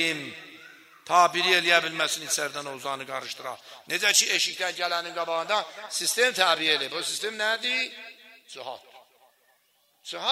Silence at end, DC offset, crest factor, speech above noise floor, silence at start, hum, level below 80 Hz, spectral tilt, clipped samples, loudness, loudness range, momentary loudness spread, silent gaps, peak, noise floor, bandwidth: 0 s; under 0.1%; 24 dB; 40 dB; 0 s; none; -84 dBFS; 0 dB/octave; under 0.1%; -24 LUFS; 5 LU; 20 LU; none; -4 dBFS; -67 dBFS; 16 kHz